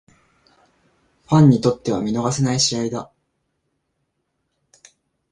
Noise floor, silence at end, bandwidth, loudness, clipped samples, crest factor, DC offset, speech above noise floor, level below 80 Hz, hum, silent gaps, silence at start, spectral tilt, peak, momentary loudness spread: -73 dBFS; 2.25 s; 11 kHz; -18 LUFS; under 0.1%; 20 dB; under 0.1%; 56 dB; -54 dBFS; none; none; 1.3 s; -5.5 dB/octave; -2 dBFS; 11 LU